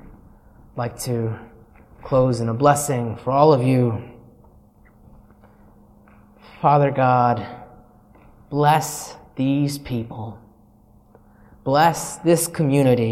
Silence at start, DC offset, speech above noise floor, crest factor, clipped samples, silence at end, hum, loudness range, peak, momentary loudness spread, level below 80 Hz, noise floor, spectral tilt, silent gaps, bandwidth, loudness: 0.05 s; under 0.1%; 34 dB; 20 dB; under 0.1%; 0 s; none; 4 LU; -2 dBFS; 15 LU; -50 dBFS; -52 dBFS; -6 dB/octave; none; 16 kHz; -20 LUFS